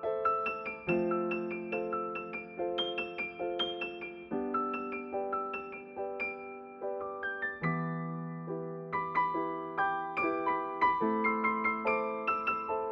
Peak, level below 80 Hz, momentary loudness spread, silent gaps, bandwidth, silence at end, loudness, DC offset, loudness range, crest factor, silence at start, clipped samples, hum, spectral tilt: -16 dBFS; -68 dBFS; 10 LU; none; 6.6 kHz; 0 s; -34 LUFS; under 0.1%; 6 LU; 18 dB; 0 s; under 0.1%; none; -7.5 dB/octave